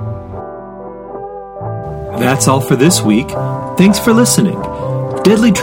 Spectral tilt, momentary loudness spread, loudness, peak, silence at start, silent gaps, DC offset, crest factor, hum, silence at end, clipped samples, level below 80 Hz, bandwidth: -5 dB/octave; 18 LU; -12 LUFS; 0 dBFS; 0 s; none; under 0.1%; 14 dB; none; 0 s; 0.1%; -38 dBFS; 17.5 kHz